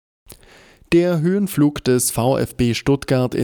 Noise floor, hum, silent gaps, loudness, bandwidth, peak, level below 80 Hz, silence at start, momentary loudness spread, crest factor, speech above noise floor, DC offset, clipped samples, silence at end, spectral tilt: -48 dBFS; none; none; -18 LUFS; over 20 kHz; -6 dBFS; -42 dBFS; 0.3 s; 3 LU; 14 dB; 31 dB; under 0.1%; under 0.1%; 0 s; -5.5 dB/octave